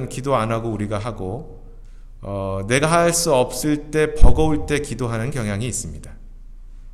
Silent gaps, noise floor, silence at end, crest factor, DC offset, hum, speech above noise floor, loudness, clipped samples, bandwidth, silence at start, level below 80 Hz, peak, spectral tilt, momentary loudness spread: none; -38 dBFS; 0 s; 18 dB; under 0.1%; none; 20 dB; -21 LUFS; under 0.1%; 14 kHz; 0 s; -26 dBFS; 0 dBFS; -5 dB/octave; 14 LU